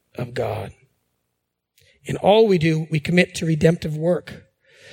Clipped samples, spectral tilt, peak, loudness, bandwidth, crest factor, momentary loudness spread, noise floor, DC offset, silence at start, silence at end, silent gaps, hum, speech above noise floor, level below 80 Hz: under 0.1%; -6.5 dB/octave; -2 dBFS; -20 LUFS; 16 kHz; 20 dB; 16 LU; -77 dBFS; under 0.1%; 0.2 s; 0.55 s; none; 60 Hz at -45 dBFS; 58 dB; -52 dBFS